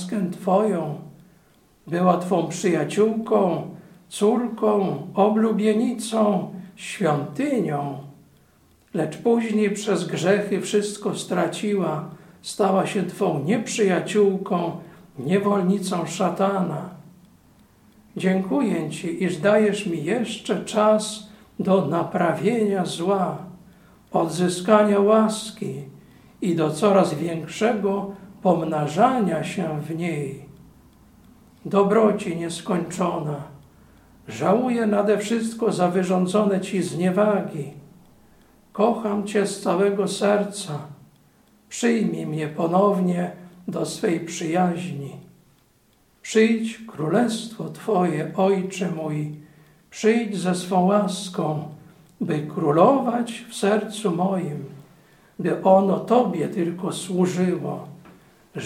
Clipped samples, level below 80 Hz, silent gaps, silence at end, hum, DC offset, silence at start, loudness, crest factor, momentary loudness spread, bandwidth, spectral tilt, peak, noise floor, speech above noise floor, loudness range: under 0.1%; -64 dBFS; none; 0 s; none; under 0.1%; 0 s; -22 LUFS; 20 dB; 13 LU; 15 kHz; -6 dB/octave; -2 dBFS; -60 dBFS; 39 dB; 3 LU